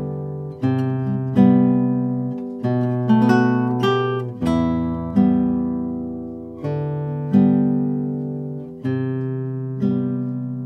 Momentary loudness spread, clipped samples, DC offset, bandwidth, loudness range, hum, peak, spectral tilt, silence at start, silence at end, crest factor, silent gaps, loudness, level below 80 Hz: 12 LU; under 0.1%; under 0.1%; 6.4 kHz; 4 LU; none; -2 dBFS; -9 dB/octave; 0 s; 0 s; 18 dB; none; -20 LUFS; -48 dBFS